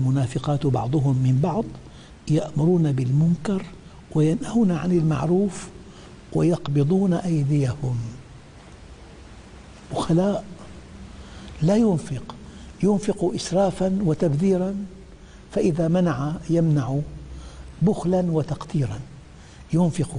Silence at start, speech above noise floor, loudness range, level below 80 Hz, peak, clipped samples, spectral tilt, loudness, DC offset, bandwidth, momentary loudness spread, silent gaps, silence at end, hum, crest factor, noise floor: 0 s; 23 dB; 4 LU; -46 dBFS; -10 dBFS; under 0.1%; -8 dB/octave; -23 LUFS; under 0.1%; 10.5 kHz; 20 LU; none; 0 s; none; 12 dB; -44 dBFS